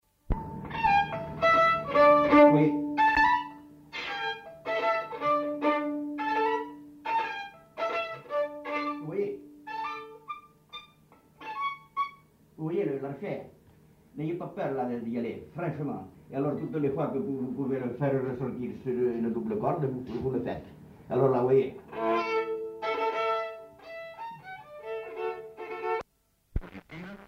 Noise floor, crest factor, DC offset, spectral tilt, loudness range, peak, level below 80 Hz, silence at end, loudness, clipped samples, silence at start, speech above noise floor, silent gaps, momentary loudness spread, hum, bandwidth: -70 dBFS; 20 dB; under 0.1%; -7.5 dB/octave; 13 LU; -10 dBFS; -50 dBFS; 0 s; -29 LUFS; under 0.1%; 0.3 s; 40 dB; none; 18 LU; none; 15.5 kHz